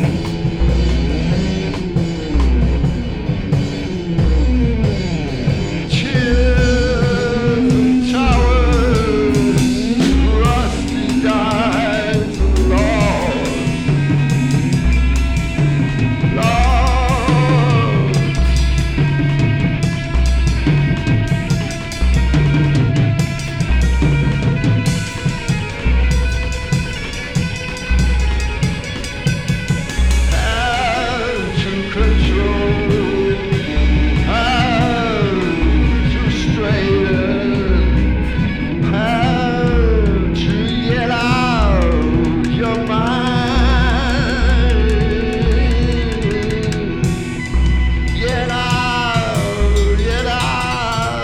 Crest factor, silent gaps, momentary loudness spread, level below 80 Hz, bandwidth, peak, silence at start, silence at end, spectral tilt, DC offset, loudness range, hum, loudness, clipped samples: 12 dB; none; 5 LU; -20 dBFS; 11.5 kHz; -2 dBFS; 0 s; 0 s; -6.5 dB/octave; under 0.1%; 3 LU; none; -16 LUFS; under 0.1%